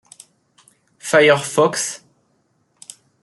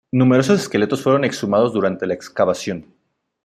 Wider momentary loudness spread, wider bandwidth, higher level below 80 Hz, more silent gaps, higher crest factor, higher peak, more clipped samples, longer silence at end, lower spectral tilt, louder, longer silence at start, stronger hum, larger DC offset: first, 27 LU vs 10 LU; second, 12.5 kHz vs 14.5 kHz; second, -68 dBFS vs -60 dBFS; neither; about the same, 20 dB vs 16 dB; about the same, -2 dBFS vs -2 dBFS; neither; first, 1.25 s vs 0.65 s; second, -3 dB/octave vs -6 dB/octave; about the same, -16 LUFS vs -18 LUFS; first, 1.05 s vs 0.15 s; neither; neither